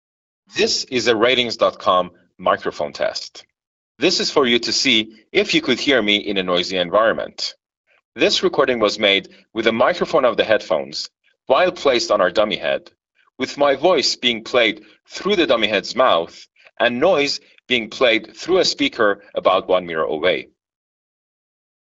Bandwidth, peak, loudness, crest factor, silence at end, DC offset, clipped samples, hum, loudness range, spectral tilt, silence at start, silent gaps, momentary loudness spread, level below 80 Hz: 8 kHz; 0 dBFS; -18 LUFS; 20 dB; 1.55 s; under 0.1%; under 0.1%; none; 2 LU; -1 dB/octave; 0.55 s; 3.67-3.95 s, 7.77-7.84 s, 8.05-8.12 s; 10 LU; -56 dBFS